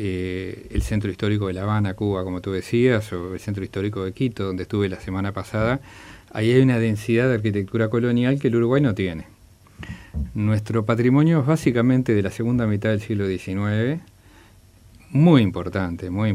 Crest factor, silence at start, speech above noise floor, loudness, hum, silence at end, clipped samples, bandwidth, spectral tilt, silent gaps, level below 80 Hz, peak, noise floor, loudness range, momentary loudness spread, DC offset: 18 dB; 0 s; 29 dB; -22 LUFS; none; 0 s; under 0.1%; 13.5 kHz; -8 dB/octave; none; -42 dBFS; -4 dBFS; -50 dBFS; 4 LU; 11 LU; under 0.1%